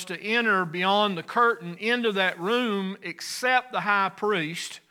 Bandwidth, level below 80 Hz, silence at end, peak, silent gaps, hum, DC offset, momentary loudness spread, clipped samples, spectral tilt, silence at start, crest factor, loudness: 19 kHz; -84 dBFS; 0.15 s; -8 dBFS; none; none; under 0.1%; 8 LU; under 0.1%; -4 dB/octave; 0 s; 18 dB; -25 LUFS